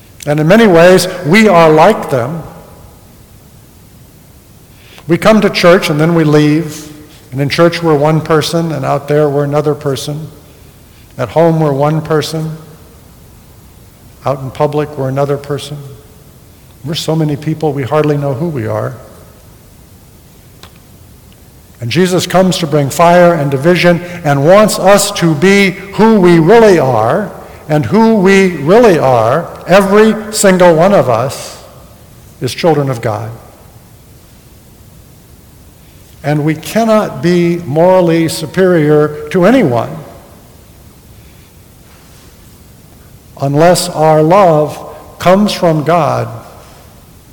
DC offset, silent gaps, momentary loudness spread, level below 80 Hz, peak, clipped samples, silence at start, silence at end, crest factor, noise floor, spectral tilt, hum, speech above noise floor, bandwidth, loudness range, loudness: under 0.1%; none; 15 LU; -42 dBFS; 0 dBFS; 0.7%; 0.25 s; 0.85 s; 12 dB; -39 dBFS; -6 dB/octave; none; 30 dB; 19.5 kHz; 10 LU; -10 LUFS